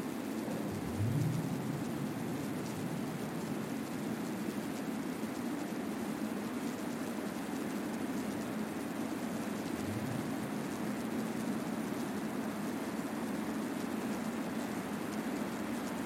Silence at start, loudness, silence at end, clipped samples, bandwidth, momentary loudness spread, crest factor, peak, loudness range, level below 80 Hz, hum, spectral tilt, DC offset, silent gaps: 0 s; -38 LUFS; 0 s; under 0.1%; 16 kHz; 2 LU; 16 dB; -22 dBFS; 1 LU; -66 dBFS; none; -5.5 dB/octave; under 0.1%; none